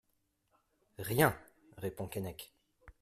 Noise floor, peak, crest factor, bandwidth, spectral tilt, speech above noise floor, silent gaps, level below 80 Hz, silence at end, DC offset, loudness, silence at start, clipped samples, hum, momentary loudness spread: -79 dBFS; -12 dBFS; 26 dB; 16 kHz; -5 dB/octave; 45 dB; none; -64 dBFS; 0.1 s; under 0.1%; -35 LUFS; 1 s; under 0.1%; none; 20 LU